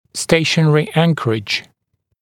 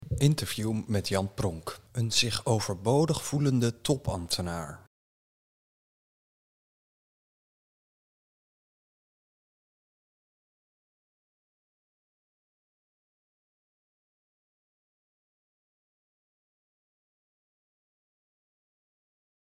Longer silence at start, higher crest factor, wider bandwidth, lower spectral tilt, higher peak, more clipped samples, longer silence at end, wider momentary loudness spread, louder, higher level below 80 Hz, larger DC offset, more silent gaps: first, 0.15 s vs 0 s; second, 16 dB vs 26 dB; second, 14.5 kHz vs 16 kHz; about the same, -5 dB/octave vs -5 dB/octave; first, 0 dBFS vs -10 dBFS; neither; second, 0.6 s vs 14.65 s; about the same, 7 LU vs 9 LU; first, -16 LUFS vs -29 LUFS; first, -50 dBFS vs -58 dBFS; neither; neither